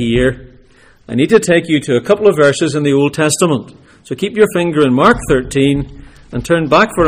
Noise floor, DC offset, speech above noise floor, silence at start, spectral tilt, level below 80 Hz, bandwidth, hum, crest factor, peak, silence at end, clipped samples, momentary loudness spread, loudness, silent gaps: -45 dBFS; under 0.1%; 33 dB; 0 s; -5 dB/octave; -36 dBFS; 16 kHz; none; 12 dB; 0 dBFS; 0 s; under 0.1%; 11 LU; -13 LUFS; none